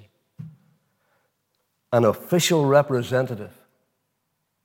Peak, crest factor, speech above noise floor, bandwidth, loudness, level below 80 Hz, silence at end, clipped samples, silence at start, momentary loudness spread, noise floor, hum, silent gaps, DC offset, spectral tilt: -4 dBFS; 20 dB; 55 dB; 17 kHz; -21 LUFS; -74 dBFS; 1.15 s; under 0.1%; 0.4 s; 25 LU; -75 dBFS; none; none; under 0.1%; -5 dB/octave